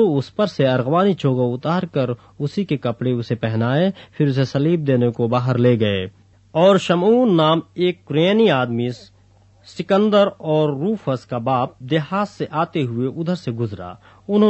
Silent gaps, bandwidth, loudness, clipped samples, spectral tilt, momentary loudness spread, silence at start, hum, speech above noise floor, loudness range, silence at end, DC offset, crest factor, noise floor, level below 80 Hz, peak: none; 8.4 kHz; -19 LUFS; under 0.1%; -7.5 dB/octave; 10 LU; 0 s; none; 34 dB; 4 LU; 0 s; under 0.1%; 16 dB; -52 dBFS; -58 dBFS; -2 dBFS